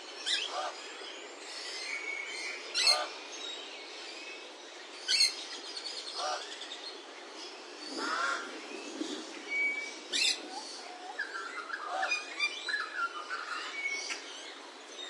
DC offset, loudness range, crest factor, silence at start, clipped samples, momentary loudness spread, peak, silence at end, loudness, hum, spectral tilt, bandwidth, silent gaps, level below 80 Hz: under 0.1%; 5 LU; 24 dB; 0 s; under 0.1%; 16 LU; -14 dBFS; 0 s; -34 LUFS; none; 2.5 dB/octave; 11.5 kHz; none; under -90 dBFS